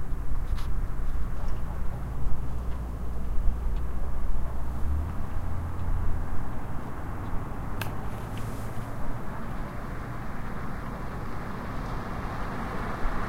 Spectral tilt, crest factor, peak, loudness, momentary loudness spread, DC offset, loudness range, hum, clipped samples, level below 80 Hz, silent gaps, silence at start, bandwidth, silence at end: -7 dB/octave; 16 dB; -8 dBFS; -35 LUFS; 4 LU; under 0.1%; 3 LU; none; under 0.1%; -32 dBFS; none; 0 s; 13 kHz; 0 s